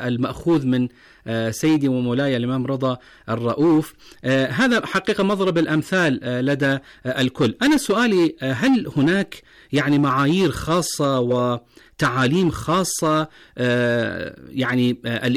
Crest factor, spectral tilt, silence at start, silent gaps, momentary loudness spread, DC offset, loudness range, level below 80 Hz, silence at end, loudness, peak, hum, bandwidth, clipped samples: 10 dB; -5.5 dB/octave; 0 s; none; 8 LU; under 0.1%; 2 LU; -50 dBFS; 0 s; -20 LUFS; -10 dBFS; none; 15 kHz; under 0.1%